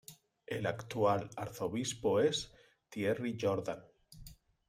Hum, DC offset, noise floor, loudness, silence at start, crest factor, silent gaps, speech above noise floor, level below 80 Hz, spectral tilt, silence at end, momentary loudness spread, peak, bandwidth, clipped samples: none; under 0.1%; -56 dBFS; -35 LUFS; 0.1 s; 18 dB; none; 21 dB; -66 dBFS; -5 dB/octave; 0.35 s; 19 LU; -18 dBFS; 16 kHz; under 0.1%